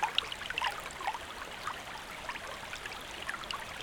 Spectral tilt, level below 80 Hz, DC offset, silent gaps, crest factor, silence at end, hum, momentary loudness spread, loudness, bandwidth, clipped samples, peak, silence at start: -1.5 dB/octave; -58 dBFS; under 0.1%; none; 28 dB; 0 s; none; 7 LU; -38 LUFS; over 20 kHz; under 0.1%; -12 dBFS; 0 s